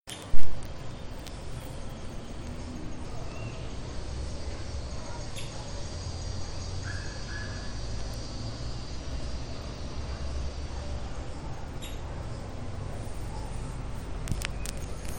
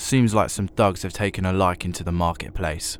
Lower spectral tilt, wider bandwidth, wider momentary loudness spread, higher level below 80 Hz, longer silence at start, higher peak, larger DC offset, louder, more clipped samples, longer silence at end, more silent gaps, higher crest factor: about the same, -5 dB/octave vs -5.5 dB/octave; second, 16 kHz vs 20 kHz; second, 5 LU vs 8 LU; about the same, -38 dBFS vs -38 dBFS; about the same, 0 s vs 0 s; about the same, -4 dBFS vs -6 dBFS; neither; second, -38 LUFS vs -23 LUFS; neither; about the same, 0 s vs 0 s; neither; first, 22 dB vs 16 dB